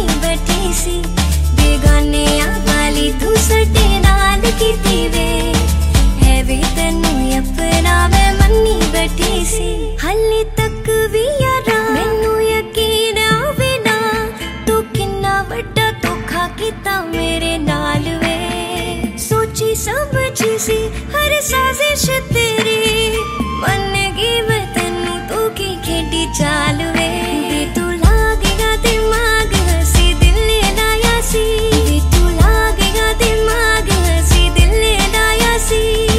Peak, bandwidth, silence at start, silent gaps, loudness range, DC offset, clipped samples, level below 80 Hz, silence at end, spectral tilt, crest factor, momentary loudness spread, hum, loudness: 0 dBFS; 16 kHz; 0 s; none; 4 LU; under 0.1%; under 0.1%; -18 dBFS; 0 s; -4 dB/octave; 14 dB; 6 LU; none; -14 LUFS